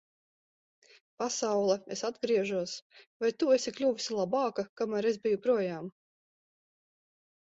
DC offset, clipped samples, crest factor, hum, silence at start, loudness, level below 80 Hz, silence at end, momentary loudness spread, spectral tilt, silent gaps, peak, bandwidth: under 0.1%; under 0.1%; 18 dB; none; 1.2 s; -31 LUFS; -78 dBFS; 1.7 s; 9 LU; -4 dB/octave; 2.82-2.90 s, 3.07-3.20 s, 4.69-4.76 s; -14 dBFS; 8 kHz